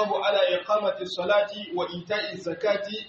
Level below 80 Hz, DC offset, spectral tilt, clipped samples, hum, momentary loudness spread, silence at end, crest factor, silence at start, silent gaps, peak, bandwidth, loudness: -70 dBFS; under 0.1%; -1.5 dB/octave; under 0.1%; none; 8 LU; 0 s; 14 dB; 0 s; none; -12 dBFS; 7.8 kHz; -26 LUFS